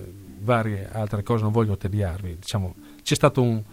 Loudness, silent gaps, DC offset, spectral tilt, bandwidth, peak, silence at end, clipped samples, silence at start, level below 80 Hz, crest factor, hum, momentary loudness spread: -25 LUFS; none; under 0.1%; -6 dB/octave; 16 kHz; -4 dBFS; 0 s; under 0.1%; 0 s; -48 dBFS; 20 dB; none; 12 LU